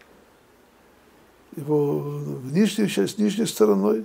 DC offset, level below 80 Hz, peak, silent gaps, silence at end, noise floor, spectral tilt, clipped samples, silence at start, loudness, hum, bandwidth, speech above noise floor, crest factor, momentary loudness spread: under 0.1%; -68 dBFS; -6 dBFS; none; 0 s; -55 dBFS; -6 dB/octave; under 0.1%; 1.55 s; -23 LUFS; none; 16 kHz; 34 dB; 18 dB; 12 LU